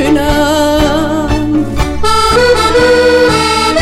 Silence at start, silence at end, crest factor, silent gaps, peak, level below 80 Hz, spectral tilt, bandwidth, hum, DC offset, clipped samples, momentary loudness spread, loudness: 0 s; 0 s; 8 dB; none; 0 dBFS; -22 dBFS; -4.5 dB/octave; 16 kHz; none; under 0.1%; under 0.1%; 6 LU; -10 LUFS